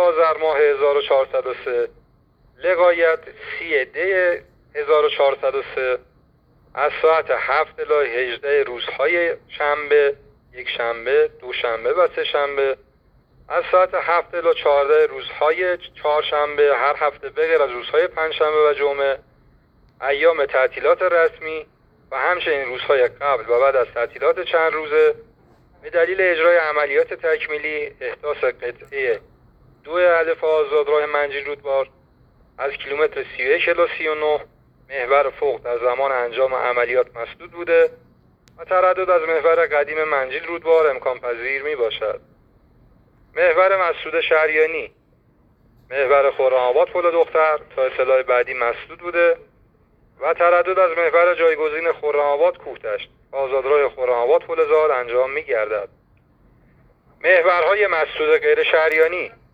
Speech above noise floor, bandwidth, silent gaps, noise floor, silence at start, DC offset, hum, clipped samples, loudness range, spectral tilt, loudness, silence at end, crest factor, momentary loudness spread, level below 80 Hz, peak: 38 dB; 5.2 kHz; none; -57 dBFS; 0 s; under 0.1%; none; under 0.1%; 3 LU; -5.5 dB/octave; -19 LUFS; 0.25 s; 18 dB; 11 LU; -56 dBFS; -2 dBFS